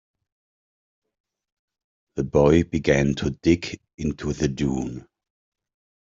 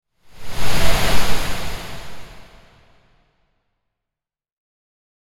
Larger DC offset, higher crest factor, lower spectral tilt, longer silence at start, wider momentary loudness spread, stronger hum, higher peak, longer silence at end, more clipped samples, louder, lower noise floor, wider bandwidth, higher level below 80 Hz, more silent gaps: neither; about the same, 20 dB vs 16 dB; first, -6.5 dB/octave vs -3.5 dB/octave; first, 2.15 s vs 0.4 s; second, 15 LU vs 23 LU; neither; second, -4 dBFS vs 0 dBFS; second, 1.1 s vs 3 s; neither; about the same, -23 LUFS vs -23 LUFS; about the same, under -90 dBFS vs -87 dBFS; second, 7.8 kHz vs 16.5 kHz; second, -44 dBFS vs -30 dBFS; first, 3.94-3.98 s vs none